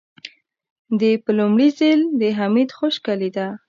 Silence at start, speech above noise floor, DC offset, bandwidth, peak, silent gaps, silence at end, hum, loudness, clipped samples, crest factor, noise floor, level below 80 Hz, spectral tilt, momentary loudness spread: 0.25 s; 25 dB; under 0.1%; 7.2 kHz; -6 dBFS; 0.70-0.85 s; 0.1 s; none; -18 LUFS; under 0.1%; 14 dB; -43 dBFS; -72 dBFS; -7 dB/octave; 11 LU